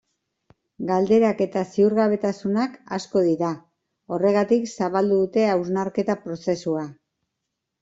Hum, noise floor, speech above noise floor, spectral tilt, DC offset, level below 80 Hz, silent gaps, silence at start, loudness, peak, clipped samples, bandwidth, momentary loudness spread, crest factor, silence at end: none; -81 dBFS; 59 dB; -7 dB/octave; under 0.1%; -64 dBFS; none; 0.8 s; -22 LUFS; -6 dBFS; under 0.1%; 7.8 kHz; 9 LU; 16 dB; 0.9 s